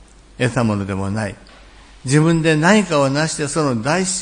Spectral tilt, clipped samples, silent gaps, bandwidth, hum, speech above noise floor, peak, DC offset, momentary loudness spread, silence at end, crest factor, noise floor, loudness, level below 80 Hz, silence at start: -5 dB/octave; under 0.1%; none; 10.5 kHz; none; 26 dB; 0 dBFS; under 0.1%; 10 LU; 0 s; 18 dB; -43 dBFS; -17 LUFS; -46 dBFS; 0.4 s